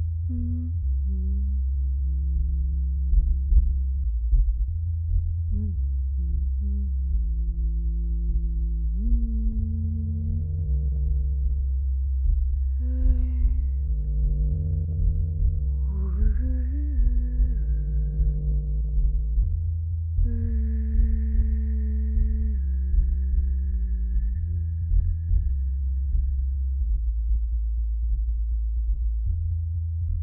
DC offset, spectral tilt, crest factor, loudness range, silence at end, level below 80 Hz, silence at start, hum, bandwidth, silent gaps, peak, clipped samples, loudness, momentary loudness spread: under 0.1%; -14.5 dB/octave; 14 dB; 2 LU; 0 s; -24 dBFS; 0 s; none; 1.8 kHz; none; -8 dBFS; under 0.1%; -27 LUFS; 3 LU